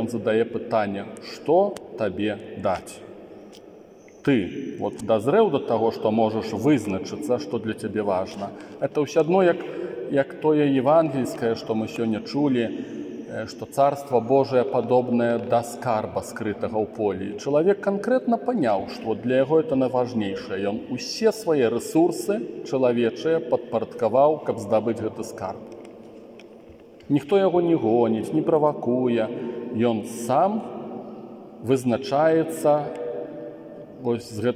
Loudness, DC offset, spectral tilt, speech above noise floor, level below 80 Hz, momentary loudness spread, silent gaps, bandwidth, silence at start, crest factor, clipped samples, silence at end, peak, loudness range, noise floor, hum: -23 LUFS; under 0.1%; -6.5 dB/octave; 24 dB; -66 dBFS; 13 LU; none; 16 kHz; 0 s; 16 dB; under 0.1%; 0 s; -6 dBFS; 3 LU; -47 dBFS; none